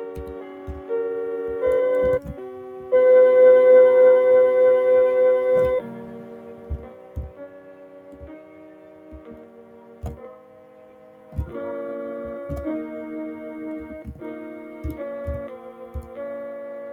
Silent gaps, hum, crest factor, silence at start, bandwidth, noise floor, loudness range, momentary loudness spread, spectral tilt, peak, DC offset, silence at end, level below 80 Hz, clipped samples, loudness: none; none; 16 dB; 0 s; 3.8 kHz; -47 dBFS; 24 LU; 24 LU; -8.5 dB/octave; -4 dBFS; under 0.1%; 0 s; -44 dBFS; under 0.1%; -18 LUFS